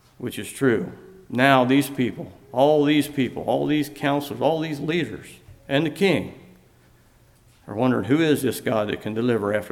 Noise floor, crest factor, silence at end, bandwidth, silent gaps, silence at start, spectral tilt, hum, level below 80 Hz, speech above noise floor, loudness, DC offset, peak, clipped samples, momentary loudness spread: -55 dBFS; 20 dB; 0 s; 16.5 kHz; none; 0.2 s; -6 dB/octave; none; -58 dBFS; 34 dB; -22 LUFS; under 0.1%; -2 dBFS; under 0.1%; 14 LU